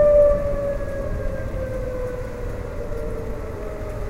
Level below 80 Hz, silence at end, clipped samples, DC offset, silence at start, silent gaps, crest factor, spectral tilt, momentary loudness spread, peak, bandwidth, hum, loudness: -30 dBFS; 0 s; under 0.1%; under 0.1%; 0 s; none; 16 dB; -8 dB/octave; 13 LU; -6 dBFS; 13 kHz; none; -25 LUFS